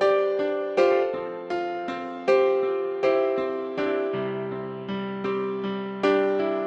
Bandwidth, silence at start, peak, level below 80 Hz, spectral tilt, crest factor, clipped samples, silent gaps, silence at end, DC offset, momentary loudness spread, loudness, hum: 7.2 kHz; 0 s; -8 dBFS; -68 dBFS; -6.5 dB/octave; 16 dB; under 0.1%; none; 0 s; under 0.1%; 10 LU; -25 LUFS; none